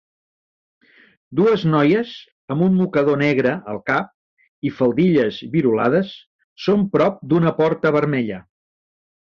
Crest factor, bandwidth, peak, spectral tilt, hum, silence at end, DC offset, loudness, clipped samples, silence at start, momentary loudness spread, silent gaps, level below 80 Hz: 16 dB; 6.8 kHz; -4 dBFS; -8.5 dB/octave; none; 0.95 s; under 0.1%; -19 LUFS; under 0.1%; 1.3 s; 11 LU; 2.32-2.48 s, 4.14-4.37 s, 4.49-4.62 s, 6.27-6.56 s; -58 dBFS